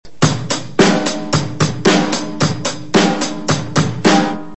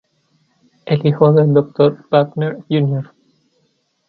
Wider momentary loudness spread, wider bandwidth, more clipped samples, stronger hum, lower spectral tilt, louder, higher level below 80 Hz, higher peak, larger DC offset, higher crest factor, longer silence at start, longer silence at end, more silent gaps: second, 6 LU vs 12 LU; first, 8.4 kHz vs 4.7 kHz; neither; neither; second, -4.5 dB/octave vs -10.5 dB/octave; about the same, -16 LUFS vs -15 LUFS; first, -46 dBFS vs -60 dBFS; about the same, 0 dBFS vs 0 dBFS; first, 3% vs under 0.1%; about the same, 16 dB vs 16 dB; second, 0 s vs 0.85 s; second, 0 s vs 1.05 s; neither